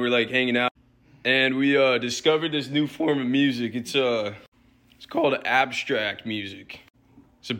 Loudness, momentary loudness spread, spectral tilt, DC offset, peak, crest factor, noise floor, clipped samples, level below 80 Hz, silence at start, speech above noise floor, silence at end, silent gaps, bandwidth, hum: -23 LUFS; 12 LU; -4.5 dB/octave; under 0.1%; -8 dBFS; 18 dB; -57 dBFS; under 0.1%; -66 dBFS; 0 s; 33 dB; 0 s; 0.71-0.75 s, 4.48-4.52 s; 17 kHz; none